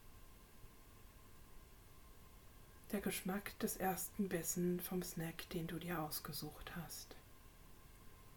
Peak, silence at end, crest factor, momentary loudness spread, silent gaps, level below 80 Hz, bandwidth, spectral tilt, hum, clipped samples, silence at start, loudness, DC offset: -26 dBFS; 0 s; 20 dB; 23 LU; none; -62 dBFS; 19 kHz; -4.5 dB/octave; none; under 0.1%; 0 s; -44 LUFS; under 0.1%